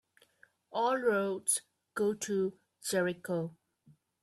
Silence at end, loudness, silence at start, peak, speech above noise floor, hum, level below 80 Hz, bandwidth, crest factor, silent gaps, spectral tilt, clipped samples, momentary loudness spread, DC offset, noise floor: 0.7 s; -33 LUFS; 0.7 s; -18 dBFS; 34 dB; none; -78 dBFS; 14 kHz; 18 dB; none; -4 dB/octave; under 0.1%; 11 LU; under 0.1%; -66 dBFS